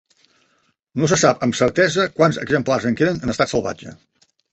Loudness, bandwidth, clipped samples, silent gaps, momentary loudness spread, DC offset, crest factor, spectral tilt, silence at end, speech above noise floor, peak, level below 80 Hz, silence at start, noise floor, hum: -18 LUFS; 8.4 kHz; under 0.1%; none; 8 LU; under 0.1%; 18 dB; -4.5 dB/octave; 0.6 s; 46 dB; -2 dBFS; -50 dBFS; 0.95 s; -64 dBFS; none